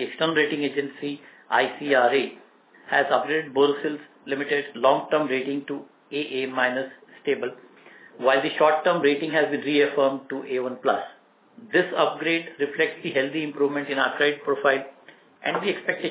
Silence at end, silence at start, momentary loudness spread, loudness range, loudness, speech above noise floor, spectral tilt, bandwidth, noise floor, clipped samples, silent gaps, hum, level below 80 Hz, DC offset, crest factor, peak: 0 s; 0 s; 11 LU; 3 LU; -24 LUFS; 26 dB; -8 dB/octave; 4 kHz; -50 dBFS; under 0.1%; none; none; -82 dBFS; under 0.1%; 20 dB; -6 dBFS